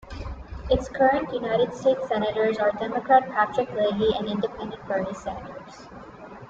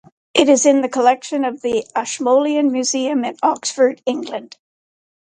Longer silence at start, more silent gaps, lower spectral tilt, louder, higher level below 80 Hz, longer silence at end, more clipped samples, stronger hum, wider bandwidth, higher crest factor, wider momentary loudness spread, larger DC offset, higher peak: second, 0.05 s vs 0.35 s; neither; first, -6 dB/octave vs -2 dB/octave; second, -24 LUFS vs -17 LUFS; first, -44 dBFS vs -64 dBFS; second, 0 s vs 0.9 s; neither; neither; second, 7.8 kHz vs 9.6 kHz; about the same, 20 dB vs 18 dB; first, 20 LU vs 10 LU; neither; second, -6 dBFS vs 0 dBFS